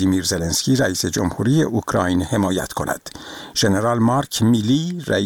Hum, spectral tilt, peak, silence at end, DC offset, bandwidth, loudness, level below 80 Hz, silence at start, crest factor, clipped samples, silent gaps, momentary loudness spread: none; -5 dB/octave; -4 dBFS; 0 s; 0.2%; 19 kHz; -19 LUFS; -44 dBFS; 0 s; 16 dB; under 0.1%; none; 8 LU